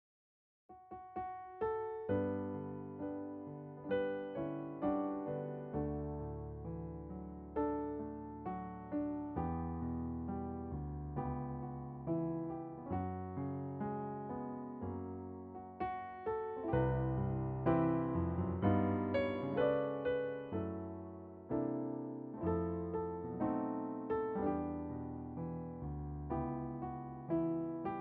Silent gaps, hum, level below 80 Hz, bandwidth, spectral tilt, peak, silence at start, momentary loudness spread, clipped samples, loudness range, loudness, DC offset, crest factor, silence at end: none; none; -56 dBFS; 4.8 kHz; -8.5 dB/octave; -20 dBFS; 0.7 s; 11 LU; under 0.1%; 7 LU; -40 LUFS; under 0.1%; 20 dB; 0 s